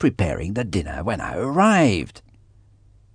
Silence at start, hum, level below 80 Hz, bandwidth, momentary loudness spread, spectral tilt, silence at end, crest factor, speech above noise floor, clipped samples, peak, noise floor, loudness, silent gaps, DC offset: 0 s; none; -40 dBFS; 10 kHz; 11 LU; -6 dB/octave; 0.95 s; 18 dB; 32 dB; under 0.1%; -4 dBFS; -53 dBFS; -21 LUFS; none; under 0.1%